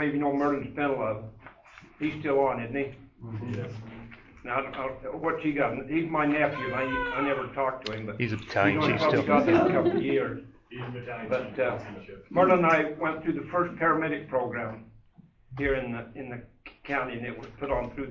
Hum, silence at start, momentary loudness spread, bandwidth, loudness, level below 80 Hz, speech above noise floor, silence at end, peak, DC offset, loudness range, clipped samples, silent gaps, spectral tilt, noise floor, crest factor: none; 0 s; 18 LU; 7.4 kHz; -28 LUFS; -54 dBFS; 30 dB; 0 s; -8 dBFS; under 0.1%; 7 LU; under 0.1%; none; -7.5 dB/octave; -57 dBFS; 20 dB